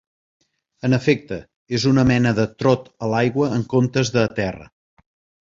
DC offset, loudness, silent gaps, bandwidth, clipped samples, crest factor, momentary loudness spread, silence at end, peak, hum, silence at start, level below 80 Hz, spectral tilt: under 0.1%; -20 LUFS; 1.56-1.66 s; 7.6 kHz; under 0.1%; 18 dB; 10 LU; 0.75 s; -2 dBFS; none; 0.85 s; -48 dBFS; -6.5 dB/octave